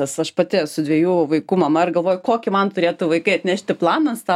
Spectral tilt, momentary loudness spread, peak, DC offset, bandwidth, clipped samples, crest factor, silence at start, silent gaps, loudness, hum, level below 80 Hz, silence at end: -5.5 dB/octave; 3 LU; -4 dBFS; under 0.1%; 14.5 kHz; under 0.1%; 16 dB; 0 s; none; -19 LUFS; none; -66 dBFS; 0 s